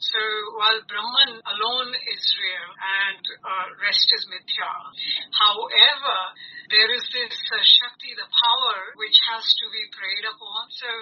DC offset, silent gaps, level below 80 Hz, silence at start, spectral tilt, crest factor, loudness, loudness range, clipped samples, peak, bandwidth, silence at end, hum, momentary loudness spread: under 0.1%; none; -88 dBFS; 0 s; 5.5 dB/octave; 22 dB; -19 LUFS; 5 LU; under 0.1%; 0 dBFS; 6.8 kHz; 0 s; none; 15 LU